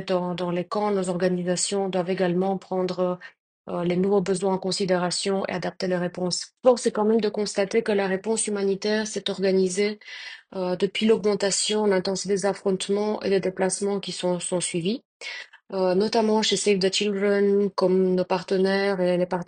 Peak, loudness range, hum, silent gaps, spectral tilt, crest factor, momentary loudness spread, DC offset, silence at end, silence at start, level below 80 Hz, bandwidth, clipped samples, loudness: -4 dBFS; 3 LU; none; 3.40-3.65 s, 15.05-15.20 s; -4.5 dB/octave; 18 dB; 7 LU; under 0.1%; 0.05 s; 0 s; -68 dBFS; 10 kHz; under 0.1%; -24 LUFS